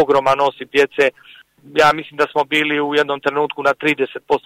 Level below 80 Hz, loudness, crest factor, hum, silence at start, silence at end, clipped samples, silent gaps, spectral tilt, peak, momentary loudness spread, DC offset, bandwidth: -58 dBFS; -17 LUFS; 14 dB; none; 0 s; 0.1 s; under 0.1%; none; -4.5 dB/octave; -4 dBFS; 5 LU; under 0.1%; 15 kHz